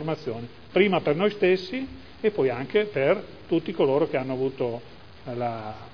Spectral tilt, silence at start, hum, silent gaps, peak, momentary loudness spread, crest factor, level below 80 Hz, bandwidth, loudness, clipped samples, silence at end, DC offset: -8 dB/octave; 0 s; none; none; -6 dBFS; 13 LU; 20 dB; -58 dBFS; 5.4 kHz; -25 LUFS; under 0.1%; 0 s; 0.4%